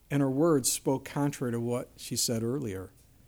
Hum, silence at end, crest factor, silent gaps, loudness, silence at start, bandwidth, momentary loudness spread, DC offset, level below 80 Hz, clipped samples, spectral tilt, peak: none; 0.4 s; 16 dB; none; -30 LUFS; 0.1 s; over 20 kHz; 11 LU; under 0.1%; -60 dBFS; under 0.1%; -4.5 dB/octave; -14 dBFS